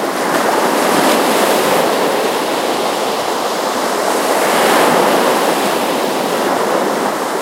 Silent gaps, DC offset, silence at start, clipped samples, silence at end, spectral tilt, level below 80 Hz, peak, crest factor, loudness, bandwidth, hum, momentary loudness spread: none; under 0.1%; 0 s; under 0.1%; 0 s; -2.5 dB/octave; -62 dBFS; 0 dBFS; 14 dB; -14 LUFS; 16 kHz; none; 5 LU